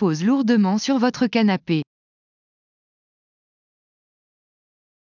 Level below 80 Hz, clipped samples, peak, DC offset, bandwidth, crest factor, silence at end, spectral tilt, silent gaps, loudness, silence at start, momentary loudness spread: -68 dBFS; under 0.1%; -6 dBFS; under 0.1%; 7.4 kHz; 16 dB; 3.2 s; -6 dB/octave; none; -20 LUFS; 0 s; 7 LU